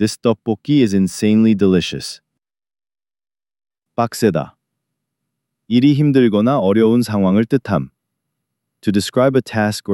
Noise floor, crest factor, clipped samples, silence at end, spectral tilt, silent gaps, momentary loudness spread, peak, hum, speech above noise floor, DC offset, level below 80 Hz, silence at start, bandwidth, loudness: -80 dBFS; 16 dB; under 0.1%; 0 s; -6.5 dB/octave; none; 11 LU; -2 dBFS; none; 65 dB; under 0.1%; -54 dBFS; 0 s; 17 kHz; -16 LUFS